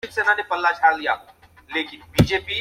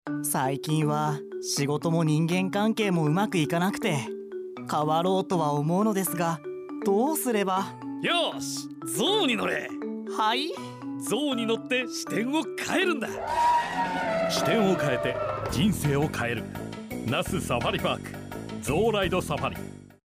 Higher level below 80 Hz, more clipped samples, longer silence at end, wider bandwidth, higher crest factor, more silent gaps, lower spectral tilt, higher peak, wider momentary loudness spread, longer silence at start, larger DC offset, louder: first, -42 dBFS vs -54 dBFS; neither; second, 0 s vs 0.15 s; about the same, 16.5 kHz vs 16 kHz; first, 20 dB vs 14 dB; neither; about the same, -5 dB/octave vs -5 dB/octave; first, -2 dBFS vs -12 dBFS; about the same, 9 LU vs 10 LU; about the same, 0.05 s vs 0.05 s; neither; first, -21 LUFS vs -27 LUFS